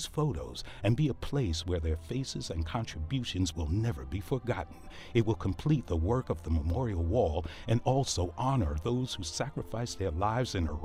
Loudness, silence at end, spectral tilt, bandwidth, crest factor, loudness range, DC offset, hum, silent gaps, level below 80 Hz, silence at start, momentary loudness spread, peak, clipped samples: -32 LUFS; 0 s; -6 dB/octave; 15 kHz; 16 dB; 3 LU; under 0.1%; none; none; -42 dBFS; 0 s; 7 LU; -14 dBFS; under 0.1%